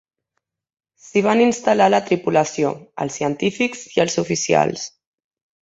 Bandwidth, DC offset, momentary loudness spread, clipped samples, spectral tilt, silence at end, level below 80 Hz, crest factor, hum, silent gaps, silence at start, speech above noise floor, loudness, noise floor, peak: 8.2 kHz; under 0.1%; 8 LU; under 0.1%; -4.5 dB/octave; 0.8 s; -60 dBFS; 18 dB; none; none; 1.15 s; 59 dB; -19 LUFS; -77 dBFS; -2 dBFS